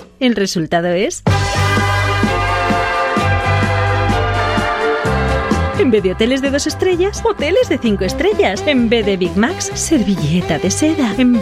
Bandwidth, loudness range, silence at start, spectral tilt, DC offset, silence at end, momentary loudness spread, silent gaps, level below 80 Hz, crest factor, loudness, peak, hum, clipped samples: 15 kHz; 0 LU; 0 s; -5 dB/octave; under 0.1%; 0 s; 3 LU; none; -30 dBFS; 14 dB; -15 LUFS; -2 dBFS; none; under 0.1%